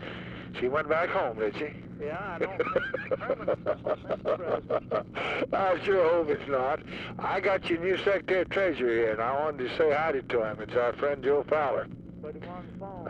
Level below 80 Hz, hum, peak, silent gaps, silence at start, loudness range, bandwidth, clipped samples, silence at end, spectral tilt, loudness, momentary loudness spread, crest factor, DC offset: -56 dBFS; none; -12 dBFS; none; 0 s; 4 LU; 9 kHz; under 0.1%; 0 s; -7 dB/octave; -29 LUFS; 13 LU; 16 dB; under 0.1%